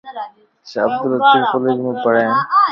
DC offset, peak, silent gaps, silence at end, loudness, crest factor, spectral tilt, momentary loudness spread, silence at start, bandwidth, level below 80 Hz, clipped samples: under 0.1%; 0 dBFS; none; 0 s; -15 LUFS; 16 dB; -6.5 dB/octave; 17 LU; 0.05 s; 6.6 kHz; -68 dBFS; under 0.1%